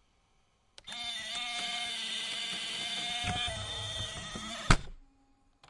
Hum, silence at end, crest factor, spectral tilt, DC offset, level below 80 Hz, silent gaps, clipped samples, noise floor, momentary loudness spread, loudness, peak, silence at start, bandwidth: none; 0.05 s; 32 dB; -2.5 dB/octave; under 0.1%; -42 dBFS; none; under 0.1%; -70 dBFS; 9 LU; -34 LUFS; -4 dBFS; 0.85 s; 11.5 kHz